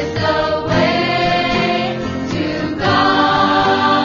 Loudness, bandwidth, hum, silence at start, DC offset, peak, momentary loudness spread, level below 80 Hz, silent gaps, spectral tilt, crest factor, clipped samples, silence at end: -15 LUFS; 7.2 kHz; none; 0 s; under 0.1%; -2 dBFS; 7 LU; -40 dBFS; none; -5.5 dB/octave; 14 dB; under 0.1%; 0 s